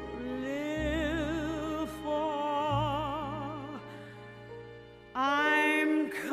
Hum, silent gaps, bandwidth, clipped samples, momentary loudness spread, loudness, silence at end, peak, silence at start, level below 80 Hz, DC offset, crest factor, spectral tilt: none; none; 15 kHz; under 0.1%; 21 LU; -31 LUFS; 0 s; -16 dBFS; 0 s; -50 dBFS; under 0.1%; 18 dB; -5.5 dB/octave